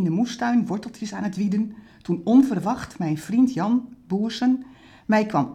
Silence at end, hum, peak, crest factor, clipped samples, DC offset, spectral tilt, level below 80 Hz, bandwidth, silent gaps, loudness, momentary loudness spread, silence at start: 0 s; none; -6 dBFS; 16 dB; under 0.1%; under 0.1%; -6.5 dB/octave; -58 dBFS; 11.5 kHz; none; -23 LUFS; 11 LU; 0 s